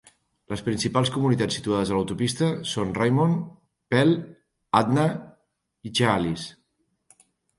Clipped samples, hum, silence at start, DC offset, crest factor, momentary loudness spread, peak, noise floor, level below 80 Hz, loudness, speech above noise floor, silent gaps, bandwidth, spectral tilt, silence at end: under 0.1%; none; 0.5 s; under 0.1%; 22 dB; 13 LU; -4 dBFS; -73 dBFS; -54 dBFS; -24 LUFS; 49 dB; none; 11.5 kHz; -5.5 dB/octave; 1.05 s